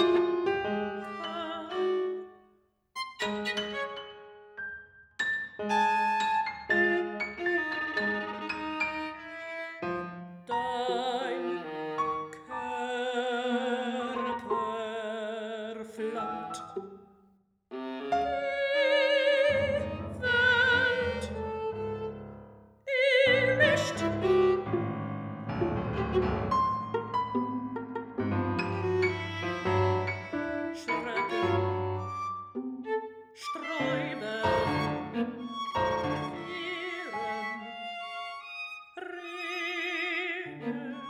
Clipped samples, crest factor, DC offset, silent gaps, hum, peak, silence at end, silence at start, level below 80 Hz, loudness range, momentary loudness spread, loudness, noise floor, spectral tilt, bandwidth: under 0.1%; 20 dB; under 0.1%; none; none; -12 dBFS; 0 s; 0 s; -56 dBFS; 8 LU; 14 LU; -30 LUFS; -67 dBFS; -5.5 dB/octave; 12 kHz